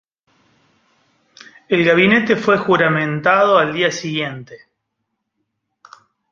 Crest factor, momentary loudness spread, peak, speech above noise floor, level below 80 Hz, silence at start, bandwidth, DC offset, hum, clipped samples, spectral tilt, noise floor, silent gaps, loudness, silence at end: 18 dB; 10 LU; 0 dBFS; 60 dB; -60 dBFS; 1.7 s; 7.4 kHz; under 0.1%; none; under 0.1%; -5.5 dB/octave; -75 dBFS; none; -15 LUFS; 1.75 s